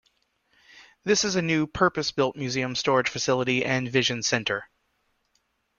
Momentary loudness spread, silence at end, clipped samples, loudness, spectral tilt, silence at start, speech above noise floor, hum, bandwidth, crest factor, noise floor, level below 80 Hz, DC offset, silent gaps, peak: 5 LU; 1.15 s; under 0.1%; -25 LUFS; -3.5 dB/octave; 0.75 s; 47 dB; none; 7.4 kHz; 20 dB; -72 dBFS; -58 dBFS; under 0.1%; none; -8 dBFS